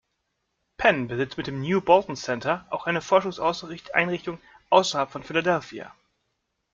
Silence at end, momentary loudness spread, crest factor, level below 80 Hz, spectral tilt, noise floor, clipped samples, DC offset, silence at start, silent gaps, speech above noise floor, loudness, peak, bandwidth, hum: 0.85 s; 13 LU; 22 dB; -58 dBFS; -4.5 dB/octave; -77 dBFS; under 0.1%; under 0.1%; 0.8 s; none; 53 dB; -24 LUFS; -2 dBFS; 7.6 kHz; none